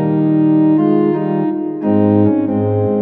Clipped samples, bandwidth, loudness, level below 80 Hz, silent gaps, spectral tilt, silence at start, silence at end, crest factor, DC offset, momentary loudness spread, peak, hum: under 0.1%; 3.9 kHz; -14 LUFS; -58 dBFS; none; -13 dB/octave; 0 s; 0 s; 12 dB; under 0.1%; 5 LU; -2 dBFS; none